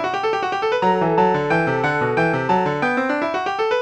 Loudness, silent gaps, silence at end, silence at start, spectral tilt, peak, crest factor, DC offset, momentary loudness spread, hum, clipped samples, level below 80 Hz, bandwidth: -19 LUFS; none; 0 s; 0 s; -6.5 dB/octave; -6 dBFS; 14 dB; under 0.1%; 4 LU; none; under 0.1%; -54 dBFS; 9.2 kHz